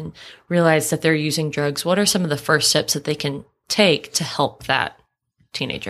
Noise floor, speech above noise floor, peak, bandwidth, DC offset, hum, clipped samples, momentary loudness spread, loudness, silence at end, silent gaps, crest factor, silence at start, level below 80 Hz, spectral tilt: -64 dBFS; 44 dB; -2 dBFS; 15.5 kHz; under 0.1%; none; under 0.1%; 11 LU; -19 LUFS; 0 s; none; 20 dB; 0 s; -56 dBFS; -3.5 dB/octave